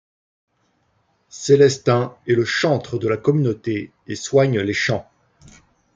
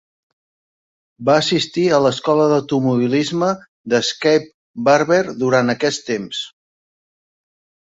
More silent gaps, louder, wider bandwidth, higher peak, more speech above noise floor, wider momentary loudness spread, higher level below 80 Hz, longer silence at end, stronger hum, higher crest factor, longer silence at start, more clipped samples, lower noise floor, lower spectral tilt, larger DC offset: second, none vs 3.68-3.84 s, 4.54-4.74 s; about the same, -19 LUFS vs -17 LUFS; about the same, 7.8 kHz vs 8 kHz; about the same, -2 dBFS vs -2 dBFS; second, 47 dB vs over 74 dB; first, 13 LU vs 8 LU; about the same, -60 dBFS vs -60 dBFS; second, 0.95 s vs 1.35 s; neither; about the same, 18 dB vs 16 dB; first, 1.35 s vs 1.2 s; neither; second, -65 dBFS vs under -90 dBFS; about the same, -5.5 dB/octave vs -5 dB/octave; neither